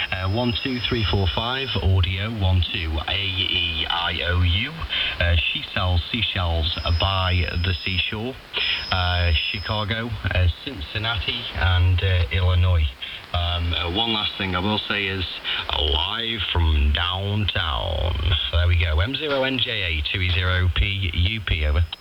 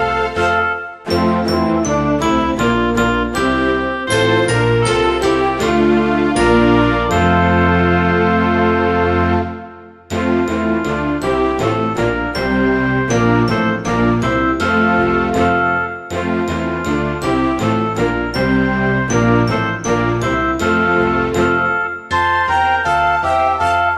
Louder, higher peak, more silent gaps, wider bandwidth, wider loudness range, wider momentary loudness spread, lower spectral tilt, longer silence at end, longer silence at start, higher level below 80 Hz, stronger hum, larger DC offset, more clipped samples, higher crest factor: second, -22 LUFS vs -15 LUFS; second, -6 dBFS vs 0 dBFS; neither; second, 6 kHz vs 13.5 kHz; second, 1 LU vs 4 LU; about the same, 4 LU vs 5 LU; about the same, -6.5 dB/octave vs -6 dB/octave; about the same, 0.05 s vs 0 s; about the same, 0 s vs 0 s; about the same, -30 dBFS vs -32 dBFS; neither; neither; neither; about the same, 16 dB vs 14 dB